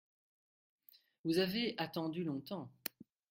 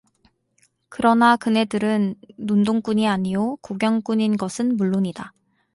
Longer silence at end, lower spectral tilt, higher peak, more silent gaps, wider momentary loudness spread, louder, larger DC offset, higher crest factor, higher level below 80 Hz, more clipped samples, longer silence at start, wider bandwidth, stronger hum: about the same, 0.4 s vs 0.45 s; about the same, -5.5 dB/octave vs -6 dB/octave; second, -16 dBFS vs -4 dBFS; neither; about the same, 12 LU vs 11 LU; second, -39 LUFS vs -21 LUFS; neither; first, 26 dB vs 16 dB; second, -78 dBFS vs -60 dBFS; neither; first, 1.25 s vs 0.9 s; first, 16.5 kHz vs 11.5 kHz; neither